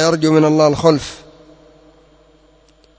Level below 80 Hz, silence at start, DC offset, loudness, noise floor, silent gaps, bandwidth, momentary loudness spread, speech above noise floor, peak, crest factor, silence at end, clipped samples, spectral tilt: -48 dBFS; 0 s; under 0.1%; -13 LUFS; -51 dBFS; none; 8 kHz; 18 LU; 38 dB; 0 dBFS; 18 dB; 1.8 s; under 0.1%; -6 dB/octave